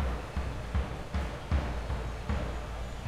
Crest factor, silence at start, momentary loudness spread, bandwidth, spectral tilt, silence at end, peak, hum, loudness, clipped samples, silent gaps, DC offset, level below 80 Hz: 16 dB; 0 s; 4 LU; 12.5 kHz; -6.5 dB/octave; 0 s; -18 dBFS; none; -36 LUFS; under 0.1%; none; under 0.1%; -36 dBFS